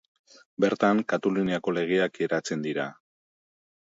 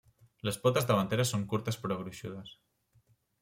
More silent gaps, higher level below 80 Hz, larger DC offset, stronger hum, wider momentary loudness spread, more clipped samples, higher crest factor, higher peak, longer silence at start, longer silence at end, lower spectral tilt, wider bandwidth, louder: neither; about the same, -70 dBFS vs -66 dBFS; neither; neither; second, 8 LU vs 15 LU; neither; about the same, 20 dB vs 20 dB; first, -6 dBFS vs -14 dBFS; first, 0.6 s vs 0.45 s; first, 1.05 s vs 0.9 s; about the same, -5.5 dB/octave vs -5 dB/octave; second, 7.8 kHz vs 16.5 kHz; first, -26 LUFS vs -32 LUFS